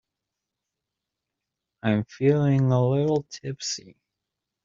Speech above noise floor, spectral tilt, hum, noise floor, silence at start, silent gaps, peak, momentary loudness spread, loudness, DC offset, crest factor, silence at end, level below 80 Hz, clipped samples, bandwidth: 62 dB; -7 dB/octave; none; -85 dBFS; 1.85 s; none; -8 dBFS; 10 LU; -24 LUFS; under 0.1%; 18 dB; 0.85 s; -62 dBFS; under 0.1%; 7.6 kHz